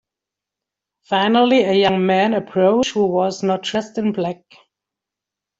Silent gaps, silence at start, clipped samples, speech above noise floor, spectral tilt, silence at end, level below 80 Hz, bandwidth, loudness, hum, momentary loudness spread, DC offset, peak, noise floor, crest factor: none; 1.1 s; under 0.1%; 68 dB; -5.5 dB/octave; 1.25 s; -58 dBFS; 8 kHz; -17 LUFS; none; 8 LU; under 0.1%; -2 dBFS; -85 dBFS; 16 dB